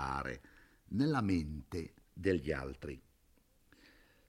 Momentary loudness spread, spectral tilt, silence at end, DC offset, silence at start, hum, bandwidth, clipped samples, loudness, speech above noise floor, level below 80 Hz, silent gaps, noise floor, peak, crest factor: 16 LU; -7 dB/octave; 1.3 s; under 0.1%; 0 s; none; 15.5 kHz; under 0.1%; -38 LUFS; 34 dB; -56 dBFS; none; -70 dBFS; -20 dBFS; 20 dB